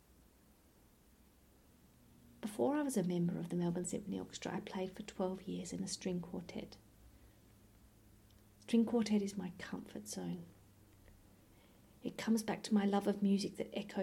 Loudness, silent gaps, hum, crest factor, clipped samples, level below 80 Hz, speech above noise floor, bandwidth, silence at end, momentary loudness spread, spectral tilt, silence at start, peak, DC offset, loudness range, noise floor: -39 LUFS; none; none; 20 dB; under 0.1%; -70 dBFS; 29 dB; 16.5 kHz; 0 s; 14 LU; -5.5 dB/octave; 2.3 s; -22 dBFS; under 0.1%; 6 LU; -67 dBFS